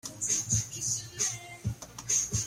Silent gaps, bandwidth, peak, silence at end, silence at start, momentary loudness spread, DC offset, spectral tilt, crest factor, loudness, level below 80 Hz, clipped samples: none; 16.5 kHz; -14 dBFS; 0 s; 0.05 s; 11 LU; under 0.1%; -2 dB/octave; 18 dB; -30 LUFS; -54 dBFS; under 0.1%